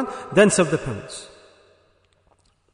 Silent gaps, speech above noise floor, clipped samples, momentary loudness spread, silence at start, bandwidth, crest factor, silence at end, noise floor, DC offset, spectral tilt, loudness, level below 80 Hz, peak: none; 42 dB; under 0.1%; 20 LU; 0 s; 10.5 kHz; 22 dB; 1.45 s; -62 dBFS; under 0.1%; -4.5 dB/octave; -20 LUFS; -54 dBFS; -2 dBFS